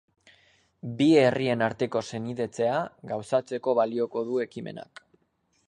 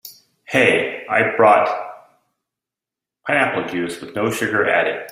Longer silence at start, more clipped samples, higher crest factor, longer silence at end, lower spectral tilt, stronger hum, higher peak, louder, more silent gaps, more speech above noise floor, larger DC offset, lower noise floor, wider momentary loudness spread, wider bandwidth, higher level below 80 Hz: first, 0.85 s vs 0.05 s; neither; about the same, 20 dB vs 18 dB; first, 0.85 s vs 0 s; first, -6.5 dB/octave vs -4.5 dB/octave; neither; second, -8 dBFS vs -2 dBFS; second, -26 LUFS vs -18 LUFS; neither; second, 45 dB vs 70 dB; neither; second, -71 dBFS vs -87 dBFS; first, 17 LU vs 12 LU; second, 10.5 kHz vs 16 kHz; second, -68 dBFS vs -62 dBFS